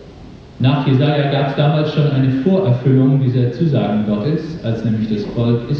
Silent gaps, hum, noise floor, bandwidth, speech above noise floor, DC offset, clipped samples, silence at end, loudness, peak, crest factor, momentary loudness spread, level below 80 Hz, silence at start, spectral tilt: none; none; -37 dBFS; 6.2 kHz; 22 dB; under 0.1%; under 0.1%; 0 s; -16 LUFS; -2 dBFS; 14 dB; 6 LU; -44 dBFS; 0 s; -9.5 dB/octave